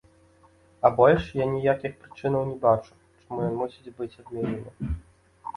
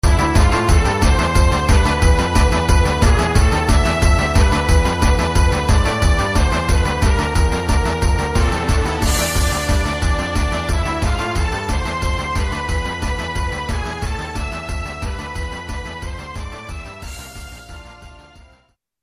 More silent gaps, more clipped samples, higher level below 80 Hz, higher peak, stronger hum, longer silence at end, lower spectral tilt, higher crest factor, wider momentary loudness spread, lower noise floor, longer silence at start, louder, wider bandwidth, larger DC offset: neither; neither; second, -46 dBFS vs -20 dBFS; about the same, -4 dBFS vs -2 dBFS; neither; second, 0.05 s vs 0.9 s; first, -8.5 dB/octave vs -5 dB/octave; first, 22 dB vs 14 dB; about the same, 17 LU vs 15 LU; about the same, -58 dBFS vs -57 dBFS; first, 0.85 s vs 0.05 s; second, -26 LUFS vs -18 LUFS; second, 11 kHz vs 15 kHz; neither